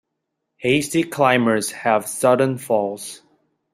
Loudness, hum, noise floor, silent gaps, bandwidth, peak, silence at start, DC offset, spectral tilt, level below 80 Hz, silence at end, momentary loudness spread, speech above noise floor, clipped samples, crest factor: -19 LUFS; none; -78 dBFS; none; 16 kHz; -2 dBFS; 0.6 s; under 0.1%; -4.5 dB/octave; -62 dBFS; 0.55 s; 10 LU; 59 dB; under 0.1%; 18 dB